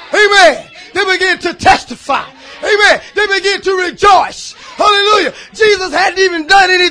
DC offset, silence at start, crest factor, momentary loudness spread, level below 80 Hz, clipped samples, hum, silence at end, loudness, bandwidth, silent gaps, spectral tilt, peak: under 0.1%; 0 s; 10 dB; 12 LU; -40 dBFS; 0.6%; none; 0 s; -10 LUFS; 11 kHz; none; -2 dB/octave; 0 dBFS